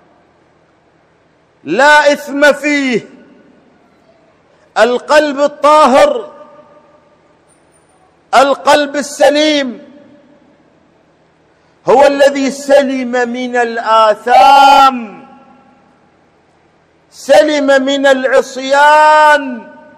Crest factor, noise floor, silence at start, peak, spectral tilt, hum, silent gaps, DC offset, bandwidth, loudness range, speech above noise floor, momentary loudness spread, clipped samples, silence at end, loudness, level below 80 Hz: 12 dB; -51 dBFS; 1.65 s; 0 dBFS; -2.5 dB/octave; none; none; under 0.1%; 15 kHz; 5 LU; 42 dB; 13 LU; 1%; 0.35 s; -9 LUFS; -54 dBFS